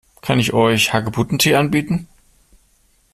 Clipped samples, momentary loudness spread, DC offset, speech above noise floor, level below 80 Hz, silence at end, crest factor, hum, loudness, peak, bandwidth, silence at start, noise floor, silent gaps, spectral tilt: under 0.1%; 7 LU; under 0.1%; 41 dB; -48 dBFS; 1.1 s; 18 dB; none; -17 LUFS; -2 dBFS; 15.5 kHz; 0.25 s; -58 dBFS; none; -4.5 dB/octave